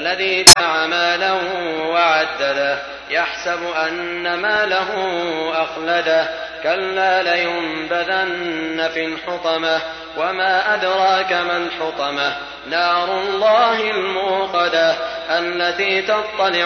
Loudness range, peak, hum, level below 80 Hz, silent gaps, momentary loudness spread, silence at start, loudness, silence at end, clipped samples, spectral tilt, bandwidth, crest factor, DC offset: 2 LU; 0 dBFS; none; -48 dBFS; none; 7 LU; 0 s; -17 LUFS; 0 s; 0.3%; -1 dB/octave; 11 kHz; 18 dB; under 0.1%